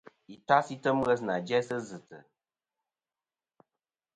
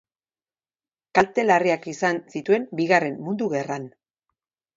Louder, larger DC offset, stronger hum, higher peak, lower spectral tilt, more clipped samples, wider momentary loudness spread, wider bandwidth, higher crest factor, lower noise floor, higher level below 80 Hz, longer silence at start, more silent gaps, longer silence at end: second, -29 LUFS vs -23 LUFS; neither; neither; second, -8 dBFS vs -2 dBFS; about the same, -5.5 dB/octave vs -5.5 dB/octave; neither; first, 18 LU vs 9 LU; first, 9.4 kHz vs 7.8 kHz; about the same, 24 dB vs 22 dB; about the same, under -90 dBFS vs under -90 dBFS; second, -70 dBFS vs -64 dBFS; second, 0.3 s vs 1.15 s; neither; first, 1.95 s vs 0.9 s